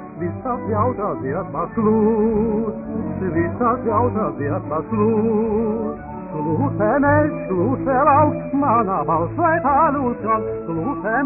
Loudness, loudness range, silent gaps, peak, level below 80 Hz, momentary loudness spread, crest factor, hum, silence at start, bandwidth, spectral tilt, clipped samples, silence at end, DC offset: -20 LUFS; 3 LU; none; -4 dBFS; -44 dBFS; 9 LU; 16 dB; none; 0 s; 2.8 kHz; -13 dB/octave; under 0.1%; 0 s; under 0.1%